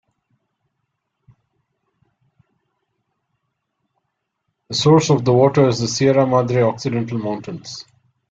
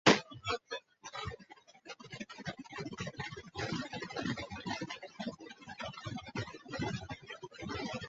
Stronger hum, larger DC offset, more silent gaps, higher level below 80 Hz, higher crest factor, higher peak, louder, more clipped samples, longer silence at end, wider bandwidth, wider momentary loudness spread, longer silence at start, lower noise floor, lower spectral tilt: neither; neither; neither; about the same, -56 dBFS vs -60 dBFS; second, 20 dB vs 30 dB; first, -2 dBFS vs -10 dBFS; first, -17 LUFS vs -40 LUFS; neither; first, 0.5 s vs 0 s; about the same, 7.8 kHz vs 8 kHz; first, 16 LU vs 10 LU; first, 4.7 s vs 0.05 s; first, -75 dBFS vs -59 dBFS; first, -6 dB/octave vs -3 dB/octave